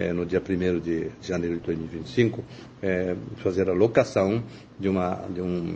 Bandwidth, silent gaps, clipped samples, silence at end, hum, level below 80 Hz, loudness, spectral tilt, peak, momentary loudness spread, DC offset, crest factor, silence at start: 8.6 kHz; none; under 0.1%; 0 s; none; -52 dBFS; -26 LUFS; -7.5 dB/octave; -6 dBFS; 9 LU; under 0.1%; 20 dB; 0 s